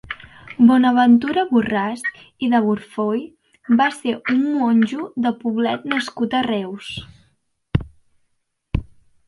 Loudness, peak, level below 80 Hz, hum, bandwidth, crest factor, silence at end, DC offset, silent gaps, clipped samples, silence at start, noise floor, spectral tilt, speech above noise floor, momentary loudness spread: -19 LUFS; -2 dBFS; -42 dBFS; none; 11.5 kHz; 18 dB; 0.45 s; under 0.1%; none; under 0.1%; 0.05 s; -69 dBFS; -6.5 dB/octave; 51 dB; 14 LU